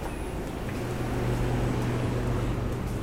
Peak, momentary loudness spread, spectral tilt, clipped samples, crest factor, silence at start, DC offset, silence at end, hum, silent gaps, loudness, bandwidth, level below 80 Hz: -16 dBFS; 6 LU; -7 dB/octave; under 0.1%; 12 dB; 0 s; 0.2%; 0 s; none; none; -30 LUFS; 16 kHz; -36 dBFS